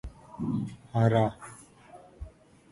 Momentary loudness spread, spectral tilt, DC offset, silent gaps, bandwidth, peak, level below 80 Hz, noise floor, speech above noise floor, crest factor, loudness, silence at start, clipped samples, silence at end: 24 LU; -8 dB/octave; under 0.1%; none; 11.5 kHz; -10 dBFS; -52 dBFS; -53 dBFS; 25 dB; 22 dB; -29 LUFS; 0.05 s; under 0.1%; 0.45 s